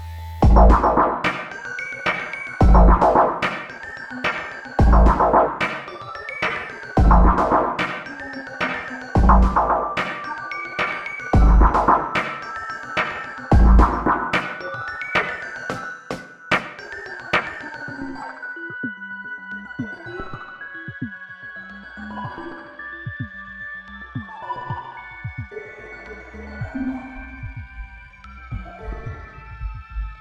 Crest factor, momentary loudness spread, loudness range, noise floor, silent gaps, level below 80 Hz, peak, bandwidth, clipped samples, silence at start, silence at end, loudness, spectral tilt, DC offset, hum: 20 dB; 20 LU; 15 LU; -41 dBFS; none; -24 dBFS; 0 dBFS; 7.6 kHz; under 0.1%; 0 s; 0.05 s; -20 LUFS; -7 dB/octave; under 0.1%; none